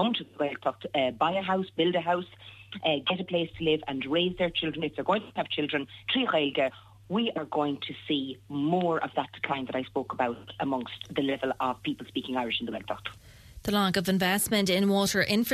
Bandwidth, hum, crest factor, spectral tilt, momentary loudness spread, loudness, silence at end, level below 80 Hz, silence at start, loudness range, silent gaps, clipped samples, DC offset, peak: 14 kHz; none; 18 dB; -4.5 dB/octave; 9 LU; -29 LUFS; 0 s; -60 dBFS; 0 s; 3 LU; none; under 0.1%; under 0.1%; -10 dBFS